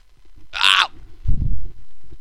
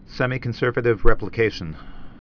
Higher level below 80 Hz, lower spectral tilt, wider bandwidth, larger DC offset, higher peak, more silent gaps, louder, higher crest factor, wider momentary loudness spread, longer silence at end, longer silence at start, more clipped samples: about the same, -28 dBFS vs -26 dBFS; second, -2 dB/octave vs -7.5 dB/octave; first, 15 kHz vs 5.4 kHz; neither; about the same, 0 dBFS vs 0 dBFS; neither; first, -18 LUFS vs -23 LUFS; about the same, 18 dB vs 20 dB; first, 17 LU vs 13 LU; about the same, 0 s vs 0.1 s; first, 0.25 s vs 0.1 s; neither